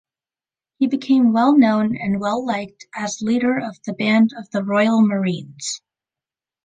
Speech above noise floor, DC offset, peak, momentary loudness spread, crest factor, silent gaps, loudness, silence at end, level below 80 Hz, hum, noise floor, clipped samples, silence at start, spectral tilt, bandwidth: over 72 dB; under 0.1%; -4 dBFS; 13 LU; 16 dB; none; -19 LUFS; 0.9 s; -62 dBFS; none; under -90 dBFS; under 0.1%; 0.8 s; -5.5 dB/octave; 9.6 kHz